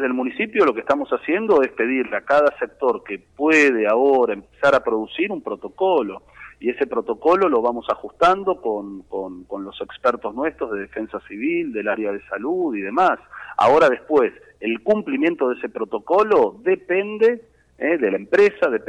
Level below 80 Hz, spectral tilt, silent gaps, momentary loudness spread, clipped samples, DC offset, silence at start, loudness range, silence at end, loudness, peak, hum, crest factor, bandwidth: -58 dBFS; -5.5 dB/octave; none; 13 LU; under 0.1%; under 0.1%; 0 s; 6 LU; 0.05 s; -20 LUFS; -6 dBFS; none; 14 dB; 9.8 kHz